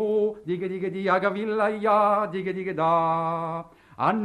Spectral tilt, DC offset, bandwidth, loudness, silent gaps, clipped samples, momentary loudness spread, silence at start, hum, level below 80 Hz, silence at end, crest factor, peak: -7.5 dB/octave; under 0.1%; 10 kHz; -25 LUFS; none; under 0.1%; 9 LU; 0 s; none; -66 dBFS; 0 s; 16 dB; -8 dBFS